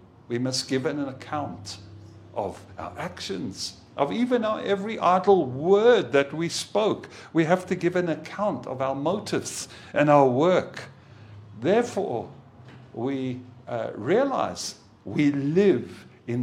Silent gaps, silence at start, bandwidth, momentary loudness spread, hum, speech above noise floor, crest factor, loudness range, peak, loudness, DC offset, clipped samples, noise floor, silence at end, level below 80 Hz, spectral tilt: none; 0.3 s; 14.5 kHz; 17 LU; none; 23 dB; 20 dB; 8 LU; -4 dBFS; -25 LUFS; under 0.1%; under 0.1%; -47 dBFS; 0 s; -66 dBFS; -5.5 dB/octave